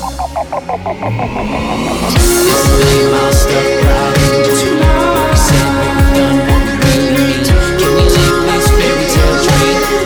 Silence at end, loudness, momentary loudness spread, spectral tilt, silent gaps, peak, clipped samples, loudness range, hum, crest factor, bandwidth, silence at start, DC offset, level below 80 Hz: 0 s; -11 LUFS; 8 LU; -5 dB/octave; none; 0 dBFS; under 0.1%; 1 LU; none; 10 dB; over 20 kHz; 0 s; under 0.1%; -16 dBFS